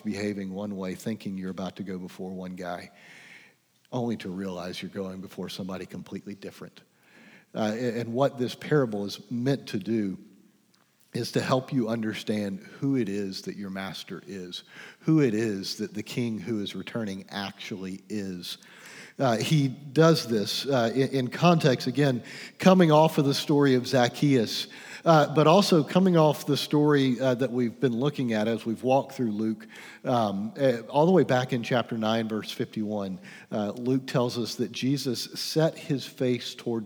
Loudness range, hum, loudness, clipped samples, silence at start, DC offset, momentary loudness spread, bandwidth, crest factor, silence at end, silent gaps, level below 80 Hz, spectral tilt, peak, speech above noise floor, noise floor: 13 LU; none; -27 LUFS; under 0.1%; 0.05 s; under 0.1%; 16 LU; over 20 kHz; 22 dB; 0 s; none; -78 dBFS; -6 dB/octave; -6 dBFS; 38 dB; -65 dBFS